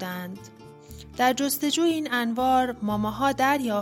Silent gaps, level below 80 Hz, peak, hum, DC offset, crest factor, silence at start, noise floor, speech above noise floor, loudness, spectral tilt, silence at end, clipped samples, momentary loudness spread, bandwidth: none; -54 dBFS; -8 dBFS; none; under 0.1%; 18 dB; 0 s; -44 dBFS; 20 dB; -24 LUFS; -3.5 dB/octave; 0 s; under 0.1%; 17 LU; 16.5 kHz